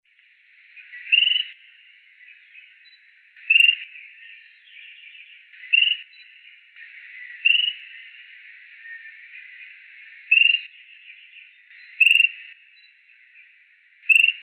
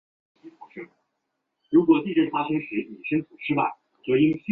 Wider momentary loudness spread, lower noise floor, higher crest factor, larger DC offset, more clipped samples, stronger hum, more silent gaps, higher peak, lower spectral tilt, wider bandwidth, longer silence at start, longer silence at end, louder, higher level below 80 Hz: first, 27 LU vs 21 LU; second, -57 dBFS vs -79 dBFS; about the same, 20 dB vs 18 dB; neither; neither; neither; neither; about the same, -6 dBFS vs -6 dBFS; second, 10 dB/octave vs -10 dB/octave; first, 13 kHz vs 4 kHz; first, 0.95 s vs 0.45 s; about the same, 0.05 s vs 0 s; first, -17 LUFS vs -24 LUFS; second, under -90 dBFS vs -66 dBFS